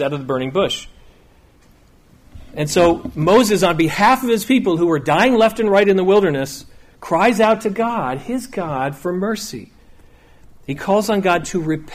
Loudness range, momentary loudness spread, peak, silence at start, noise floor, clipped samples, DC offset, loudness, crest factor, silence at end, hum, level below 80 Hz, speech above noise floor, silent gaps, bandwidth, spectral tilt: 7 LU; 12 LU; -2 dBFS; 0 s; -50 dBFS; under 0.1%; under 0.1%; -17 LUFS; 14 dB; 0 s; none; -46 dBFS; 33 dB; none; 15.5 kHz; -5 dB/octave